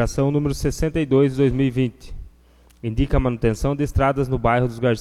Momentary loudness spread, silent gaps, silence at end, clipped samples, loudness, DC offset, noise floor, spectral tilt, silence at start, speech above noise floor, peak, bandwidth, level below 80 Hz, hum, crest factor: 7 LU; none; 0 s; under 0.1%; -21 LUFS; under 0.1%; -52 dBFS; -7 dB/octave; 0 s; 32 dB; -4 dBFS; 14 kHz; -30 dBFS; none; 16 dB